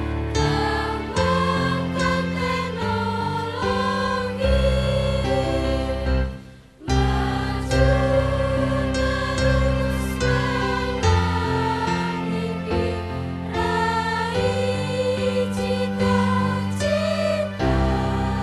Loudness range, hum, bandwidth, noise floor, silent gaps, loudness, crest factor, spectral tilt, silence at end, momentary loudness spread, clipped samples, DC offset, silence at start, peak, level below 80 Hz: 2 LU; none; 13 kHz; -42 dBFS; none; -22 LUFS; 16 dB; -6 dB/octave; 0 s; 5 LU; under 0.1%; under 0.1%; 0 s; -6 dBFS; -30 dBFS